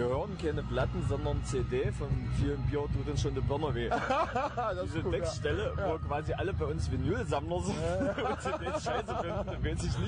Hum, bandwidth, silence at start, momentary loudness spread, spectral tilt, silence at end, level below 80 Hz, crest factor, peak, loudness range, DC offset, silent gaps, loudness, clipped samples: none; 10.5 kHz; 0 s; 3 LU; -6.5 dB/octave; 0 s; -42 dBFS; 12 dB; -20 dBFS; 1 LU; under 0.1%; none; -33 LUFS; under 0.1%